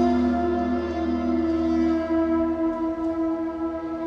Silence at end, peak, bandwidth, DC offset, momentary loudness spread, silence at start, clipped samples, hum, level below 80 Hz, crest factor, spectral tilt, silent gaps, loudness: 0 s; -12 dBFS; 6.6 kHz; under 0.1%; 5 LU; 0 s; under 0.1%; none; -42 dBFS; 12 dB; -8 dB/octave; none; -24 LUFS